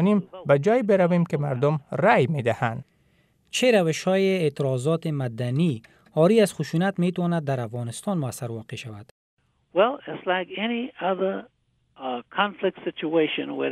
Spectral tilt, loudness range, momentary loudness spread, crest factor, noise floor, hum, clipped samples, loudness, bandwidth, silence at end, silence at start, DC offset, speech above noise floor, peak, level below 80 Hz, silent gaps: -6 dB/octave; 5 LU; 12 LU; 18 dB; -64 dBFS; none; under 0.1%; -24 LUFS; 13.5 kHz; 0 s; 0 s; under 0.1%; 40 dB; -6 dBFS; -68 dBFS; 9.11-9.37 s